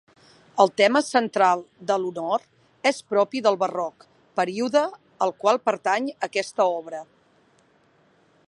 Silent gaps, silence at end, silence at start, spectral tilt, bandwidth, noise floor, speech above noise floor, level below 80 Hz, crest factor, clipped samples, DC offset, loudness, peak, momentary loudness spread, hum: none; 1.45 s; 0.55 s; -4 dB/octave; 11.5 kHz; -61 dBFS; 38 dB; -78 dBFS; 22 dB; under 0.1%; under 0.1%; -23 LUFS; -4 dBFS; 11 LU; none